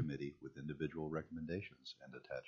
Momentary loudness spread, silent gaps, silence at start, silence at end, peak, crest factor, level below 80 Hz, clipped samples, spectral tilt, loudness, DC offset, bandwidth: 9 LU; none; 0 s; 0 s; -28 dBFS; 18 dB; -68 dBFS; under 0.1%; -6 dB/octave; -47 LUFS; under 0.1%; 7.2 kHz